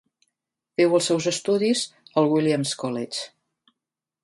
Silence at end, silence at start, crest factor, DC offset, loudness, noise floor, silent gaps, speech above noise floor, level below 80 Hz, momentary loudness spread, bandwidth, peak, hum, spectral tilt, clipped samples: 0.95 s; 0.8 s; 18 dB; under 0.1%; -23 LUFS; -87 dBFS; none; 65 dB; -72 dBFS; 11 LU; 11.5 kHz; -6 dBFS; none; -4.5 dB/octave; under 0.1%